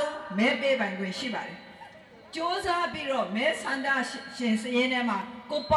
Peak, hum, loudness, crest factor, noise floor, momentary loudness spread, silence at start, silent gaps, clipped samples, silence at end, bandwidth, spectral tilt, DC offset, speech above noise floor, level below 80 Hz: -12 dBFS; none; -28 LUFS; 18 dB; -50 dBFS; 14 LU; 0 s; none; under 0.1%; 0 s; 12 kHz; -4 dB/octave; under 0.1%; 22 dB; -58 dBFS